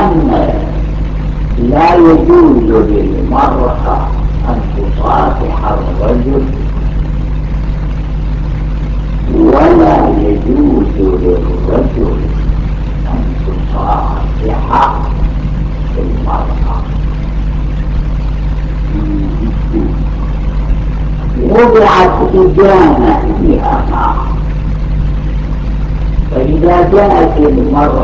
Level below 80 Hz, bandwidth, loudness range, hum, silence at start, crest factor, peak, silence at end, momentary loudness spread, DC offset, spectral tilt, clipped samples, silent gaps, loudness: -14 dBFS; 6.6 kHz; 7 LU; none; 0 s; 10 dB; 0 dBFS; 0 s; 11 LU; under 0.1%; -9 dB/octave; 0.7%; none; -11 LUFS